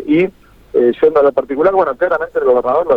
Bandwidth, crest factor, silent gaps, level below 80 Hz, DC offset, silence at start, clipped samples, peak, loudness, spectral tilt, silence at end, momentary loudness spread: 5 kHz; 12 dB; none; -48 dBFS; under 0.1%; 0 s; under 0.1%; -2 dBFS; -14 LUFS; -8 dB/octave; 0 s; 5 LU